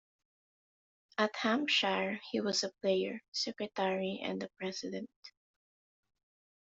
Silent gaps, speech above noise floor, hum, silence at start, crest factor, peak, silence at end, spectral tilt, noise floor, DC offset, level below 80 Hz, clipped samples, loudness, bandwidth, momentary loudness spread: 3.28-3.32 s, 5.16-5.22 s; over 55 dB; none; 1.2 s; 22 dB; -14 dBFS; 1.45 s; -2 dB/octave; under -90 dBFS; under 0.1%; -80 dBFS; under 0.1%; -34 LUFS; 8 kHz; 11 LU